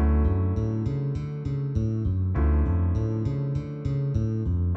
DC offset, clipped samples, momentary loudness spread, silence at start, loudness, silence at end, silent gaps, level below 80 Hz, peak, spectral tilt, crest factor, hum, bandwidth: under 0.1%; under 0.1%; 6 LU; 0 s; -27 LUFS; 0 s; none; -30 dBFS; -12 dBFS; -10.5 dB/octave; 12 dB; none; 6 kHz